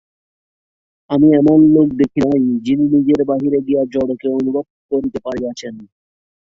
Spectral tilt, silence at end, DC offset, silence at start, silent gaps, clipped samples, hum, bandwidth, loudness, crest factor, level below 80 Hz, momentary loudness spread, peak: -8.5 dB/octave; 0.75 s; under 0.1%; 1.1 s; 4.70-4.89 s; under 0.1%; none; 7.2 kHz; -15 LUFS; 14 dB; -52 dBFS; 13 LU; -2 dBFS